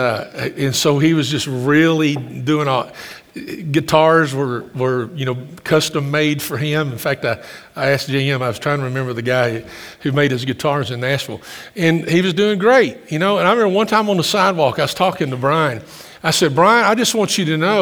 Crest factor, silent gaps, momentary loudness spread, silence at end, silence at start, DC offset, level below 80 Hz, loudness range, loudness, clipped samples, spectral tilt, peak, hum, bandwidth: 16 dB; none; 12 LU; 0 s; 0 s; under 0.1%; -56 dBFS; 4 LU; -17 LUFS; under 0.1%; -5 dB/octave; 0 dBFS; none; over 20 kHz